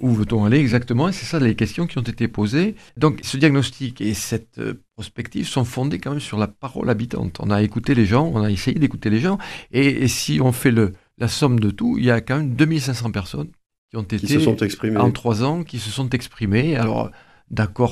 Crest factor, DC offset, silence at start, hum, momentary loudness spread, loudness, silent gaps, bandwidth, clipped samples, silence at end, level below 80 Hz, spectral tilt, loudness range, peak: 20 dB; under 0.1%; 0 s; none; 10 LU; -20 LUFS; 13.66-13.70 s, 13.78-13.88 s; 14.5 kHz; under 0.1%; 0 s; -44 dBFS; -6 dB/octave; 4 LU; 0 dBFS